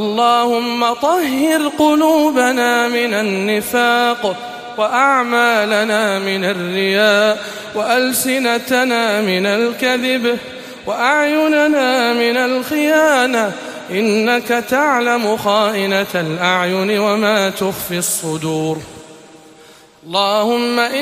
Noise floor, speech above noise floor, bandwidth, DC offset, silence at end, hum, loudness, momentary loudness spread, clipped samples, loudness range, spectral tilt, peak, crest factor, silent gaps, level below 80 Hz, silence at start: -43 dBFS; 28 dB; 15.5 kHz; under 0.1%; 0 s; none; -15 LUFS; 7 LU; under 0.1%; 3 LU; -3.5 dB/octave; -2 dBFS; 14 dB; none; -58 dBFS; 0 s